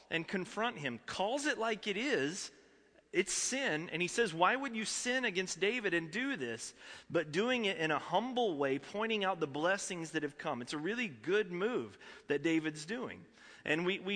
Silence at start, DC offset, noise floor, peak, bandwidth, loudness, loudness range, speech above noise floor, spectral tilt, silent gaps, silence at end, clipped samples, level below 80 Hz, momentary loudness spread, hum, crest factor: 0.1 s; under 0.1%; -66 dBFS; -14 dBFS; 10.5 kHz; -35 LUFS; 3 LU; 30 dB; -3.5 dB/octave; none; 0 s; under 0.1%; -74 dBFS; 9 LU; none; 22 dB